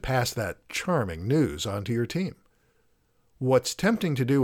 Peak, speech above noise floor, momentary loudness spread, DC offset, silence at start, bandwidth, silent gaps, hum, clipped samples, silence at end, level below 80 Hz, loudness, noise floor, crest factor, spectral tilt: -10 dBFS; 41 dB; 8 LU; under 0.1%; 0.05 s; 18 kHz; none; none; under 0.1%; 0 s; -50 dBFS; -27 LUFS; -66 dBFS; 18 dB; -5.5 dB/octave